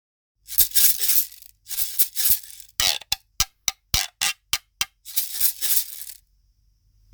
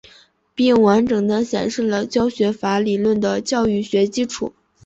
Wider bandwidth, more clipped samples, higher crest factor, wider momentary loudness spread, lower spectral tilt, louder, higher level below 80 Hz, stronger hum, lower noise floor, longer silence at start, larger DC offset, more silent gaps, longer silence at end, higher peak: first, over 20 kHz vs 8.2 kHz; neither; first, 24 dB vs 14 dB; first, 14 LU vs 8 LU; second, 1.5 dB/octave vs -5.5 dB/octave; about the same, -20 LUFS vs -18 LUFS; first, -46 dBFS vs -52 dBFS; neither; first, -62 dBFS vs -51 dBFS; about the same, 0.5 s vs 0.55 s; neither; neither; first, 1 s vs 0.35 s; first, 0 dBFS vs -4 dBFS